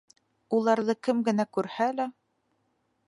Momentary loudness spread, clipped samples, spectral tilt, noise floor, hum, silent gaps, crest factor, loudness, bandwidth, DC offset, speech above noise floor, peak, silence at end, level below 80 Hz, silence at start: 6 LU; under 0.1%; -6 dB/octave; -74 dBFS; none; none; 20 dB; -28 LUFS; 11.5 kHz; under 0.1%; 47 dB; -10 dBFS; 0.95 s; -82 dBFS; 0.5 s